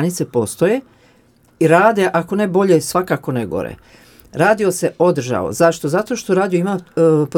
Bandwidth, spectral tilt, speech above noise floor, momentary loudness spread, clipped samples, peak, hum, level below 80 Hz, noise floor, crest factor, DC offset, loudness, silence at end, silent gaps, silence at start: 18 kHz; -6 dB/octave; 37 dB; 8 LU; under 0.1%; 0 dBFS; none; -54 dBFS; -53 dBFS; 16 dB; under 0.1%; -16 LUFS; 0 s; none; 0 s